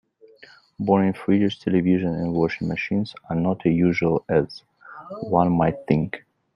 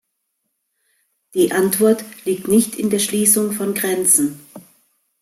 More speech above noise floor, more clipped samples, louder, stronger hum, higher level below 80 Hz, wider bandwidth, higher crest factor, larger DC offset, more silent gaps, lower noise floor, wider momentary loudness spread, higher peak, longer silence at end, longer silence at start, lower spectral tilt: second, 29 dB vs 56 dB; neither; second, -22 LUFS vs -17 LUFS; neither; first, -54 dBFS vs -62 dBFS; second, 6.4 kHz vs 16.5 kHz; about the same, 20 dB vs 18 dB; neither; neither; second, -51 dBFS vs -73 dBFS; first, 12 LU vs 9 LU; about the same, -4 dBFS vs -2 dBFS; second, 0.4 s vs 0.6 s; second, 0.8 s vs 1.35 s; first, -9 dB/octave vs -3.5 dB/octave